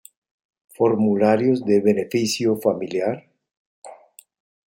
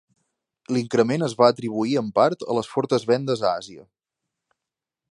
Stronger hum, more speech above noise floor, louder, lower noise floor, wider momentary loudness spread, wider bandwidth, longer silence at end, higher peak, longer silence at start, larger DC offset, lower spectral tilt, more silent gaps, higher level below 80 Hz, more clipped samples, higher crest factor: neither; second, 29 dB vs 65 dB; about the same, -20 LUFS vs -22 LUFS; second, -48 dBFS vs -87 dBFS; about the same, 7 LU vs 8 LU; first, 16.5 kHz vs 11.5 kHz; second, 0.7 s vs 1.3 s; about the same, -4 dBFS vs -2 dBFS; about the same, 0.8 s vs 0.7 s; neither; about the same, -5.5 dB/octave vs -6 dB/octave; first, 3.57-3.82 s vs none; about the same, -68 dBFS vs -68 dBFS; neither; about the same, 18 dB vs 20 dB